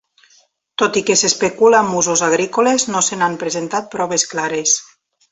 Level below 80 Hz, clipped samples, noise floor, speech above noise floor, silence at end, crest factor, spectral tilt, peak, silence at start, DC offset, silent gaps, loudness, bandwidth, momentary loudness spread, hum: -60 dBFS; under 0.1%; -55 dBFS; 39 dB; 0.5 s; 16 dB; -2 dB/octave; -2 dBFS; 0.8 s; under 0.1%; none; -16 LUFS; 8.4 kHz; 8 LU; none